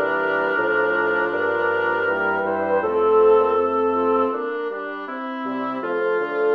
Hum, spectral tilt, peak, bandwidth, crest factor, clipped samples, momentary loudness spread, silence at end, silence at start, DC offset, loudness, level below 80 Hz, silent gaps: none; -7 dB/octave; -6 dBFS; 5 kHz; 14 dB; under 0.1%; 11 LU; 0 s; 0 s; under 0.1%; -21 LUFS; -64 dBFS; none